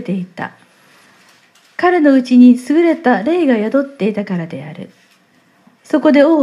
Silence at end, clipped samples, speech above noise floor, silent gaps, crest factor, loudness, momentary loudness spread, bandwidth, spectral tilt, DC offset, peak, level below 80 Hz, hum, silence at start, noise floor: 0 s; under 0.1%; 40 dB; none; 14 dB; -13 LUFS; 20 LU; 11 kHz; -7 dB/octave; under 0.1%; 0 dBFS; -68 dBFS; none; 0 s; -53 dBFS